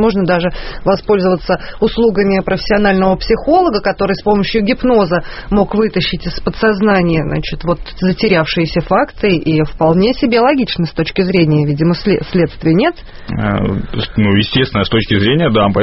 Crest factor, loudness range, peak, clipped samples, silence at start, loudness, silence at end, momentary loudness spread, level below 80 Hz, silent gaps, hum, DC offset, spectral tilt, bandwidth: 12 dB; 2 LU; 0 dBFS; under 0.1%; 0 s; -13 LUFS; 0 s; 7 LU; -30 dBFS; none; none; under 0.1%; -5 dB/octave; 6 kHz